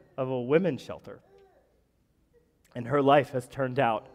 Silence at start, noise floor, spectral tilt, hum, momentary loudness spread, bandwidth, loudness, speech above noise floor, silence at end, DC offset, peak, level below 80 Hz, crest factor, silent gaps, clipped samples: 0.2 s; -69 dBFS; -7 dB/octave; none; 21 LU; 14.5 kHz; -27 LUFS; 42 dB; 0.15 s; under 0.1%; -8 dBFS; -66 dBFS; 20 dB; none; under 0.1%